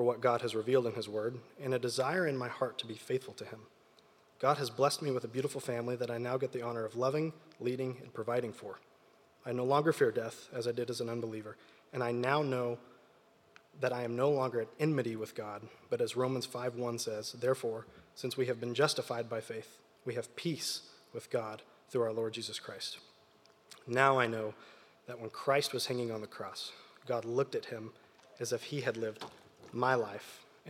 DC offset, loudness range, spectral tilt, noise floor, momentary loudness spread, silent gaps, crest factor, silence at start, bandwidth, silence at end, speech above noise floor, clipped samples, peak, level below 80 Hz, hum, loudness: under 0.1%; 4 LU; -5 dB/octave; -65 dBFS; 15 LU; none; 26 dB; 0 s; 16.5 kHz; 0 s; 30 dB; under 0.1%; -10 dBFS; -86 dBFS; none; -35 LUFS